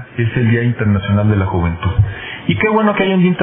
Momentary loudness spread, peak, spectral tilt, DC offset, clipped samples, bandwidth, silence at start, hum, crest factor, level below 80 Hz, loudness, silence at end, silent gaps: 6 LU; -2 dBFS; -11.5 dB/octave; under 0.1%; under 0.1%; 3.8 kHz; 0 s; none; 12 dB; -32 dBFS; -15 LUFS; 0 s; none